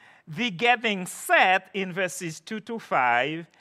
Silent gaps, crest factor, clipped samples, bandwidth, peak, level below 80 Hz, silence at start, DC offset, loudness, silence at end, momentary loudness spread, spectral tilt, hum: none; 22 dB; under 0.1%; 14.5 kHz; -4 dBFS; -80 dBFS; 0.3 s; under 0.1%; -24 LUFS; 0.15 s; 15 LU; -3.5 dB/octave; none